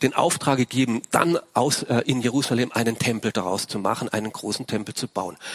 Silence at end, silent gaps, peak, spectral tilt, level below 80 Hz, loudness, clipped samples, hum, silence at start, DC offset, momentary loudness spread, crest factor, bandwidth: 0 s; none; 0 dBFS; -4.5 dB/octave; -60 dBFS; -23 LUFS; under 0.1%; none; 0 s; under 0.1%; 7 LU; 22 dB; 16 kHz